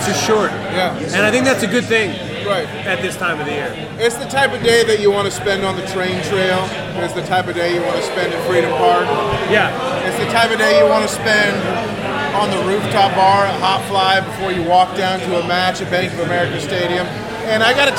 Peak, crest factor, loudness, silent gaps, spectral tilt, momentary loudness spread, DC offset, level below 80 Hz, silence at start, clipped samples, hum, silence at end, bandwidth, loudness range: -2 dBFS; 14 dB; -16 LUFS; none; -4 dB/octave; 8 LU; under 0.1%; -46 dBFS; 0 s; under 0.1%; none; 0 s; 17 kHz; 3 LU